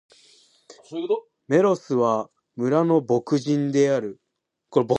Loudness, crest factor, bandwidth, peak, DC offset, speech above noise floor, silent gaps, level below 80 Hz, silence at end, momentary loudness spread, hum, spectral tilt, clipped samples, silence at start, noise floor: -23 LUFS; 18 dB; 9.2 kHz; -4 dBFS; under 0.1%; 36 dB; none; -72 dBFS; 0 s; 10 LU; none; -7 dB/octave; under 0.1%; 0.9 s; -58 dBFS